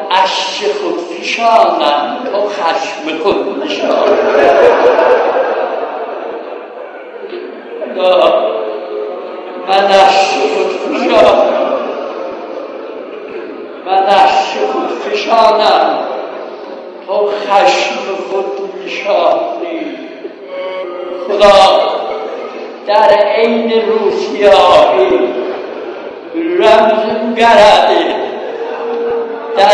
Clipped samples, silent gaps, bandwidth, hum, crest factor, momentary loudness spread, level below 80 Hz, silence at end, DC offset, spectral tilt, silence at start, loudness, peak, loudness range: 1%; none; 11 kHz; none; 12 dB; 18 LU; -48 dBFS; 0 s; under 0.1%; -3.5 dB/octave; 0 s; -11 LUFS; 0 dBFS; 5 LU